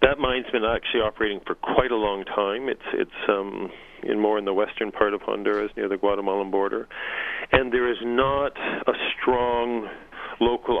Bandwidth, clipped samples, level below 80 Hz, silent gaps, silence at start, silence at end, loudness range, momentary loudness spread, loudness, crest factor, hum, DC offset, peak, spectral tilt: 4.8 kHz; under 0.1%; -46 dBFS; none; 0 s; 0 s; 2 LU; 7 LU; -24 LUFS; 22 dB; none; under 0.1%; -2 dBFS; -7 dB/octave